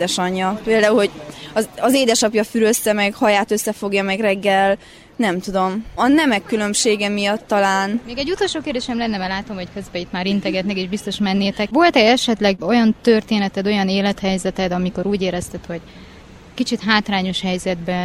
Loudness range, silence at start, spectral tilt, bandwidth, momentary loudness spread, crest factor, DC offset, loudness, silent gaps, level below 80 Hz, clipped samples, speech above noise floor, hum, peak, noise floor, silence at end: 5 LU; 0 s; -4 dB/octave; 16 kHz; 9 LU; 18 dB; under 0.1%; -18 LUFS; none; -46 dBFS; under 0.1%; 23 dB; none; 0 dBFS; -41 dBFS; 0 s